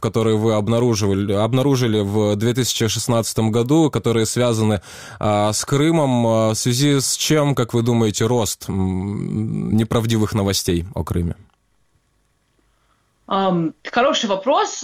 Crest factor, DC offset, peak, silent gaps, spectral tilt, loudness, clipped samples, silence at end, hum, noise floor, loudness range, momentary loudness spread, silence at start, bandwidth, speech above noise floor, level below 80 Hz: 16 dB; under 0.1%; -4 dBFS; none; -5 dB/octave; -18 LUFS; under 0.1%; 0 s; none; -64 dBFS; 6 LU; 7 LU; 0 s; 16.5 kHz; 46 dB; -44 dBFS